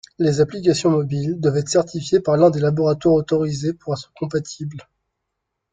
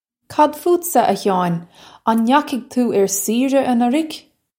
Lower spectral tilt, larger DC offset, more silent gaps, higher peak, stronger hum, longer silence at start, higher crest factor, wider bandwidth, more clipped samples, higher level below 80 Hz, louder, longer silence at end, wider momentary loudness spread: first, -6.5 dB/octave vs -4.5 dB/octave; neither; neither; about the same, -2 dBFS vs 0 dBFS; neither; about the same, 0.2 s vs 0.3 s; about the same, 16 dB vs 16 dB; second, 9.4 kHz vs 16.5 kHz; neither; first, -54 dBFS vs -66 dBFS; about the same, -19 LUFS vs -17 LUFS; first, 0.9 s vs 0.4 s; about the same, 11 LU vs 9 LU